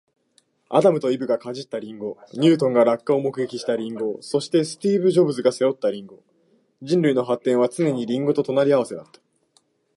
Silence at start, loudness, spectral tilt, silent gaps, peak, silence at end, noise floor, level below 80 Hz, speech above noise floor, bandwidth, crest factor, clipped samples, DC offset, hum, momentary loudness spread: 0.7 s; -21 LUFS; -6.5 dB/octave; none; -4 dBFS; 0.95 s; -64 dBFS; -74 dBFS; 43 dB; 11.5 kHz; 18 dB; under 0.1%; under 0.1%; none; 13 LU